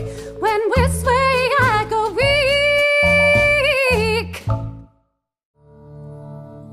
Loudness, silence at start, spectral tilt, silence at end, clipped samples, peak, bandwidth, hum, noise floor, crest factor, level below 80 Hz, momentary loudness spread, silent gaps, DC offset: -16 LUFS; 0 s; -4.5 dB/octave; 0 s; under 0.1%; -4 dBFS; 15.5 kHz; none; -68 dBFS; 14 dB; -34 dBFS; 20 LU; 5.45-5.54 s; under 0.1%